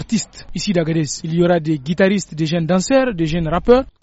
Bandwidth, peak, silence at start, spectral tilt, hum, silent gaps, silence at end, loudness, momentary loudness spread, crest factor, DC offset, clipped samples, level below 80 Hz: 8.2 kHz; 0 dBFS; 0 s; -5.5 dB/octave; none; none; 0.15 s; -17 LUFS; 7 LU; 16 dB; under 0.1%; under 0.1%; -38 dBFS